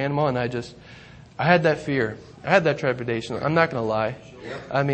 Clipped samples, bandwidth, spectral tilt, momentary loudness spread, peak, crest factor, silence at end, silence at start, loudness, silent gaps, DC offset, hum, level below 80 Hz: under 0.1%; 8.6 kHz; -6.5 dB/octave; 17 LU; -4 dBFS; 20 dB; 0 s; 0 s; -23 LUFS; none; under 0.1%; none; -56 dBFS